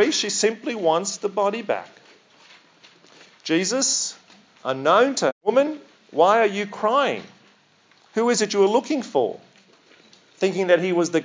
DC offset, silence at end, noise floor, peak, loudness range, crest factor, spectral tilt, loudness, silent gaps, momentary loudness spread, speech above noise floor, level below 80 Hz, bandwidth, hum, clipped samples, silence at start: under 0.1%; 0 s; -58 dBFS; -4 dBFS; 5 LU; 18 dB; -3 dB/octave; -21 LUFS; 5.32-5.41 s; 11 LU; 37 dB; -86 dBFS; 7.8 kHz; none; under 0.1%; 0 s